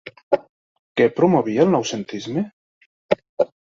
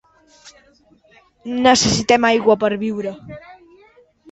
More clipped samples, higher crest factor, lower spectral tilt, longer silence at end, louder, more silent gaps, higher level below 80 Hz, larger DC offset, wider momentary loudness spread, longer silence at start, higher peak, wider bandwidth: neither; about the same, 20 dB vs 18 dB; first, -6 dB/octave vs -3.5 dB/octave; second, 0.15 s vs 0.8 s; second, -21 LUFS vs -16 LUFS; first, 0.23-0.31 s, 0.49-0.95 s, 2.53-3.09 s, 3.29-3.37 s vs none; second, -62 dBFS vs -48 dBFS; neither; second, 10 LU vs 23 LU; second, 0.05 s vs 0.45 s; about the same, -2 dBFS vs -2 dBFS; about the same, 7.6 kHz vs 8.2 kHz